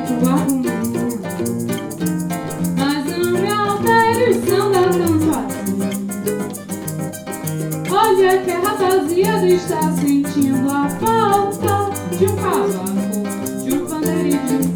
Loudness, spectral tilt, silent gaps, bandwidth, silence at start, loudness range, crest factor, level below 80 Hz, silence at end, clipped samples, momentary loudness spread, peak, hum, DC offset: -18 LUFS; -5.5 dB/octave; none; over 20 kHz; 0 s; 4 LU; 14 dB; -54 dBFS; 0 s; under 0.1%; 8 LU; -2 dBFS; none; under 0.1%